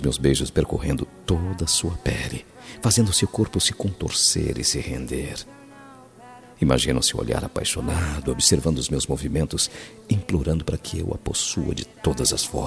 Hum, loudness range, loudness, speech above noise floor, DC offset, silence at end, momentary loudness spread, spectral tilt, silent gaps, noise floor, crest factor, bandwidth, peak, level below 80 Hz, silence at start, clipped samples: none; 3 LU; -23 LUFS; 22 dB; under 0.1%; 0 s; 10 LU; -4 dB/octave; none; -46 dBFS; 22 dB; 14.5 kHz; -2 dBFS; -36 dBFS; 0 s; under 0.1%